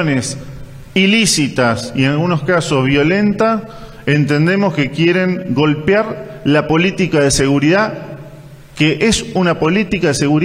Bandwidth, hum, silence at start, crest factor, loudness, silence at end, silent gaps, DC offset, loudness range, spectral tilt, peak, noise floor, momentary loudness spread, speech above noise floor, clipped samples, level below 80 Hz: 14.5 kHz; none; 0 s; 14 dB; -14 LUFS; 0 s; none; under 0.1%; 1 LU; -5 dB/octave; 0 dBFS; -36 dBFS; 10 LU; 22 dB; under 0.1%; -38 dBFS